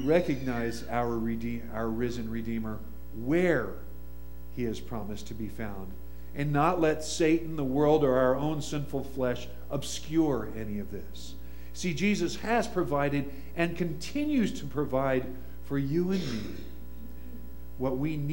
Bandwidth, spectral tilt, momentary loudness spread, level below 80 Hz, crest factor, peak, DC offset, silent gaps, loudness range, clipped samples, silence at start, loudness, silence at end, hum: 16.5 kHz; -6 dB/octave; 19 LU; -46 dBFS; 20 dB; -10 dBFS; 1%; none; 6 LU; under 0.1%; 0 s; -30 LUFS; 0 s; none